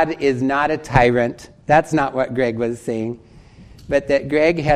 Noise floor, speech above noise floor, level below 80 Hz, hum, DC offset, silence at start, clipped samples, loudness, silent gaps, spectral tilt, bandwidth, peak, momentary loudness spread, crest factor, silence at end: -43 dBFS; 26 dB; -40 dBFS; none; under 0.1%; 0 s; under 0.1%; -19 LUFS; none; -6.5 dB/octave; 12.5 kHz; 0 dBFS; 9 LU; 18 dB; 0 s